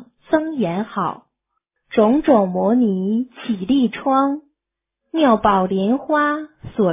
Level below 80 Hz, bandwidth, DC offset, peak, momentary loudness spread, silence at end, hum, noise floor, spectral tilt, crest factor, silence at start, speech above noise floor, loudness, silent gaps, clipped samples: -52 dBFS; 3.8 kHz; under 0.1%; -2 dBFS; 10 LU; 0 s; none; -83 dBFS; -11 dB/octave; 16 dB; 0 s; 65 dB; -18 LUFS; none; under 0.1%